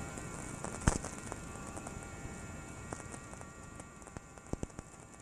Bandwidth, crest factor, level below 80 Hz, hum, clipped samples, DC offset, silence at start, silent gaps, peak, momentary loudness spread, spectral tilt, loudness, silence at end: 14 kHz; 32 dB; -48 dBFS; none; under 0.1%; under 0.1%; 0 s; none; -10 dBFS; 15 LU; -4.5 dB/octave; -43 LUFS; 0 s